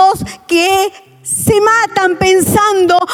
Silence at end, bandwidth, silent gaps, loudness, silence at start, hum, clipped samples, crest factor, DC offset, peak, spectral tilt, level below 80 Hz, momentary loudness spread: 0 s; 18 kHz; none; -11 LUFS; 0 s; none; under 0.1%; 10 dB; under 0.1%; 0 dBFS; -3.5 dB/octave; -42 dBFS; 9 LU